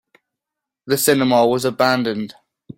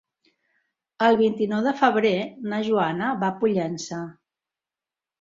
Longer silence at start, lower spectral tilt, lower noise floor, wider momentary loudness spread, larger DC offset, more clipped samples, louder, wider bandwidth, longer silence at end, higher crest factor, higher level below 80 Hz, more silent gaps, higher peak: second, 0.85 s vs 1 s; second, -4 dB/octave vs -5.5 dB/octave; second, -84 dBFS vs under -90 dBFS; about the same, 11 LU vs 11 LU; neither; neither; first, -17 LUFS vs -23 LUFS; first, 16.5 kHz vs 7.6 kHz; second, 0.05 s vs 1.1 s; about the same, 18 dB vs 20 dB; first, -60 dBFS vs -66 dBFS; neither; about the same, -2 dBFS vs -4 dBFS